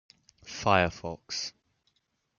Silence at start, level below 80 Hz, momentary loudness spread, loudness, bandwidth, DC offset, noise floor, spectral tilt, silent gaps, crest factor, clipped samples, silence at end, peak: 0.45 s; -60 dBFS; 15 LU; -29 LUFS; 7.4 kHz; under 0.1%; -75 dBFS; -4 dB/octave; none; 26 dB; under 0.1%; 0.9 s; -6 dBFS